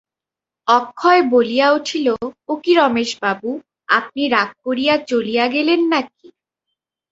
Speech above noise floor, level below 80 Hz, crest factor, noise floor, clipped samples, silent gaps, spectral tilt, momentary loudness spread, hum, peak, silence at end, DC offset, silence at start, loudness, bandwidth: 71 dB; -62 dBFS; 18 dB; -88 dBFS; under 0.1%; none; -3.5 dB/octave; 11 LU; none; 0 dBFS; 1.05 s; under 0.1%; 0.65 s; -17 LUFS; 8 kHz